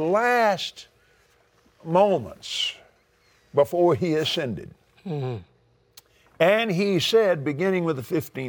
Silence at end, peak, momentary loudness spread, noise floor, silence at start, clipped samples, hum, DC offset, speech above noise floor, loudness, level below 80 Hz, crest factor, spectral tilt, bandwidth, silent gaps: 0 s; -6 dBFS; 13 LU; -62 dBFS; 0 s; under 0.1%; none; under 0.1%; 39 dB; -23 LUFS; -64 dBFS; 18 dB; -5 dB/octave; over 20 kHz; none